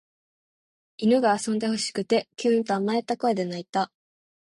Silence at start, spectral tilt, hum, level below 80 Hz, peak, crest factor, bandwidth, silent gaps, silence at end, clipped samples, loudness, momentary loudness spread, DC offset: 1 s; -4.5 dB/octave; none; -72 dBFS; -10 dBFS; 16 dB; 11.5 kHz; 3.69-3.73 s; 0.65 s; under 0.1%; -25 LUFS; 7 LU; under 0.1%